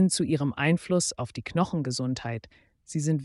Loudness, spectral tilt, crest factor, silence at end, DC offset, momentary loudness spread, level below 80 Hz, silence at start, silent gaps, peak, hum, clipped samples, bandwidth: -28 LUFS; -5 dB/octave; 18 dB; 0 s; under 0.1%; 11 LU; -58 dBFS; 0 s; none; -10 dBFS; none; under 0.1%; 11.5 kHz